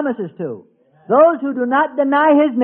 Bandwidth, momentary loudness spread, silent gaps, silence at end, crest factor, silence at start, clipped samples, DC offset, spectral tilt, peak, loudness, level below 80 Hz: 3.6 kHz; 16 LU; none; 0 s; 14 dB; 0 s; under 0.1%; under 0.1%; -11 dB/octave; -2 dBFS; -15 LUFS; -68 dBFS